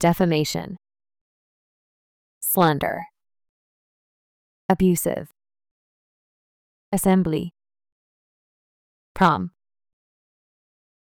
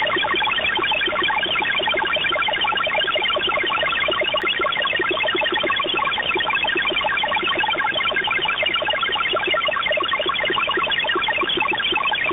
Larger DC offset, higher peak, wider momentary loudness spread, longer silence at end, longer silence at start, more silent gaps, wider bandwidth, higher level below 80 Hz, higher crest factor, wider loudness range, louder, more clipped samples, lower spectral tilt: neither; first, -6 dBFS vs -10 dBFS; first, 16 LU vs 1 LU; first, 1.65 s vs 0 s; about the same, 0 s vs 0 s; first, 1.21-2.41 s, 3.49-4.69 s, 5.71-6.92 s, 7.92-9.15 s vs none; first, over 20 kHz vs 4.6 kHz; about the same, -52 dBFS vs -50 dBFS; first, 20 dB vs 12 dB; first, 3 LU vs 0 LU; second, -22 LUFS vs -19 LUFS; neither; about the same, -5.5 dB/octave vs -5.5 dB/octave